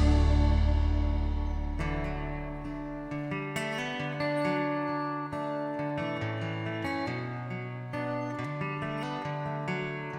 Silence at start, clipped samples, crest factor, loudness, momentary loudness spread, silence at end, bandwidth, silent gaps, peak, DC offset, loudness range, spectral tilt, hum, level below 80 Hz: 0 s; under 0.1%; 18 dB; -32 LUFS; 10 LU; 0 s; 9.6 kHz; none; -12 dBFS; under 0.1%; 3 LU; -7 dB/octave; none; -34 dBFS